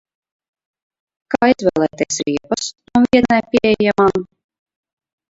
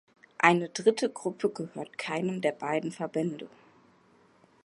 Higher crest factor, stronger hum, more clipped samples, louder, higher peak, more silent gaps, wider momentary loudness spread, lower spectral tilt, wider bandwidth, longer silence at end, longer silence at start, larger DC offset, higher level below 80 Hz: second, 18 dB vs 26 dB; neither; neither; first, -16 LUFS vs -29 LUFS; first, 0 dBFS vs -4 dBFS; neither; second, 9 LU vs 14 LU; about the same, -4.5 dB/octave vs -5 dB/octave; second, 8 kHz vs 11.5 kHz; about the same, 1.05 s vs 1.15 s; first, 1.3 s vs 0.4 s; neither; first, -48 dBFS vs -80 dBFS